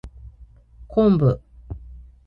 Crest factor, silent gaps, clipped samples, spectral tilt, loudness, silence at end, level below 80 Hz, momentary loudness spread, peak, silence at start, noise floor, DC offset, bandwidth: 16 dB; none; under 0.1%; -11 dB/octave; -20 LUFS; 0.25 s; -40 dBFS; 22 LU; -6 dBFS; 0.05 s; -48 dBFS; under 0.1%; 5.4 kHz